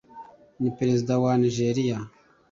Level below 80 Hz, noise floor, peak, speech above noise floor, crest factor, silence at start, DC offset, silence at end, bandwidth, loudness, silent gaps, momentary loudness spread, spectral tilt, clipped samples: -60 dBFS; -47 dBFS; -12 dBFS; 23 dB; 14 dB; 0.15 s; under 0.1%; 0.45 s; 7.6 kHz; -25 LUFS; none; 9 LU; -7 dB/octave; under 0.1%